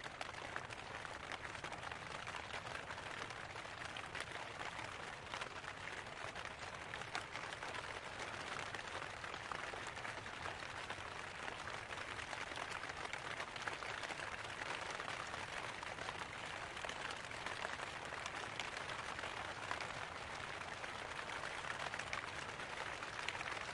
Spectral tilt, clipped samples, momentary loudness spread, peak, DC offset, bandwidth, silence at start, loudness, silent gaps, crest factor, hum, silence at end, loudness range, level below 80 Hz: -2.5 dB/octave; under 0.1%; 3 LU; -22 dBFS; under 0.1%; 11.5 kHz; 0 s; -46 LUFS; none; 24 dB; none; 0 s; 2 LU; -68 dBFS